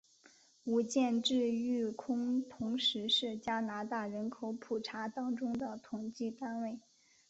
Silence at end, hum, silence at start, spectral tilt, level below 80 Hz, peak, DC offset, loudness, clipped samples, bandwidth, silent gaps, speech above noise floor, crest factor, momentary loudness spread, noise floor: 0.5 s; none; 0.65 s; -2.5 dB/octave; -76 dBFS; -18 dBFS; under 0.1%; -36 LUFS; under 0.1%; 8 kHz; none; 29 dB; 18 dB; 10 LU; -65 dBFS